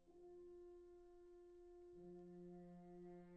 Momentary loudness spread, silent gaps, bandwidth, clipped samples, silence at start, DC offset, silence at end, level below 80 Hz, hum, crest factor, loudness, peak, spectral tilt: 6 LU; none; 6.4 kHz; under 0.1%; 0 s; under 0.1%; 0 s; -76 dBFS; none; 10 dB; -62 LUFS; -50 dBFS; -9.5 dB/octave